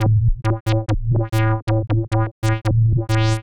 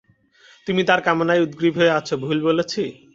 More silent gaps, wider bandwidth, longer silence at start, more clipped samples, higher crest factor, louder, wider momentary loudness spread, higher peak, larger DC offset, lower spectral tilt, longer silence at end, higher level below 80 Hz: first, 0.60-0.66 s, 1.62-1.67 s, 2.31-2.42 s vs none; first, 11 kHz vs 7.8 kHz; second, 0 s vs 0.65 s; neither; second, 10 dB vs 18 dB; about the same, -20 LUFS vs -20 LUFS; second, 3 LU vs 7 LU; second, -8 dBFS vs -2 dBFS; neither; first, -7 dB/octave vs -5.5 dB/octave; second, 0.1 s vs 0.25 s; first, -28 dBFS vs -60 dBFS